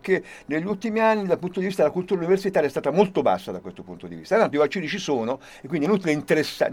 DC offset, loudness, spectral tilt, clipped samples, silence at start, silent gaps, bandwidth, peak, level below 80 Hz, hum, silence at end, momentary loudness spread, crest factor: under 0.1%; -23 LUFS; -6 dB/octave; under 0.1%; 0.05 s; none; 16.5 kHz; -4 dBFS; -62 dBFS; none; 0 s; 12 LU; 18 dB